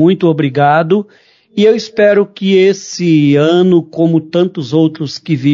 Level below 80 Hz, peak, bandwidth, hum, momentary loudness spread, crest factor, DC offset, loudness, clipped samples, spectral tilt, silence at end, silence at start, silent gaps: -58 dBFS; 0 dBFS; 7.6 kHz; none; 6 LU; 10 dB; under 0.1%; -11 LUFS; under 0.1%; -6.5 dB/octave; 0 s; 0 s; none